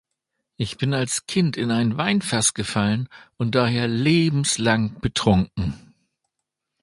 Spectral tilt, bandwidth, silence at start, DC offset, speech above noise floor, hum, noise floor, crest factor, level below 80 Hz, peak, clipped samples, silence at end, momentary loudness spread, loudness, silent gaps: -4.5 dB/octave; 11.5 kHz; 0.6 s; under 0.1%; 60 dB; none; -81 dBFS; 20 dB; -44 dBFS; -4 dBFS; under 0.1%; 1.05 s; 10 LU; -22 LUFS; none